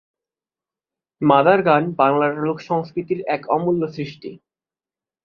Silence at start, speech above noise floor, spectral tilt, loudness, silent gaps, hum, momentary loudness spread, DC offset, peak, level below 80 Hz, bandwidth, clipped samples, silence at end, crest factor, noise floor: 1.2 s; over 71 dB; -8.5 dB/octave; -19 LUFS; none; none; 15 LU; under 0.1%; -2 dBFS; -64 dBFS; 6.8 kHz; under 0.1%; 0.9 s; 20 dB; under -90 dBFS